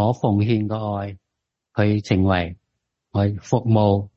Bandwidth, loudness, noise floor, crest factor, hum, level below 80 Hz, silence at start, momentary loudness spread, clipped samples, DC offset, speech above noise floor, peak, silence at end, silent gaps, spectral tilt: 7.4 kHz; -21 LUFS; -81 dBFS; 16 dB; none; -40 dBFS; 0 s; 11 LU; under 0.1%; under 0.1%; 62 dB; -4 dBFS; 0.1 s; none; -8 dB/octave